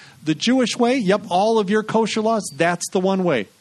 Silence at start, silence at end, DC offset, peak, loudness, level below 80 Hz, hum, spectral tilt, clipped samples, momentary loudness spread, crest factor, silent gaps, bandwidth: 0.2 s; 0.15 s; under 0.1%; -4 dBFS; -19 LUFS; -64 dBFS; none; -4.5 dB/octave; under 0.1%; 4 LU; 16 dB; none; 13 kHz